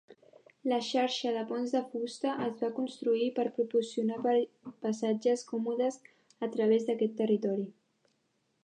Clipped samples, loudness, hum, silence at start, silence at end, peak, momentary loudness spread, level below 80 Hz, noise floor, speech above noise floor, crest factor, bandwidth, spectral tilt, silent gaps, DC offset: under 0.1%; -32 LUFS; none; 0.65 s; 0.9 s; -16 dBFS; 8 LU; -86 dBFS; -76 dBFS; 45 dB; 16 dB; 9.6 kHz; -5 dB/octave; none; under 0.1%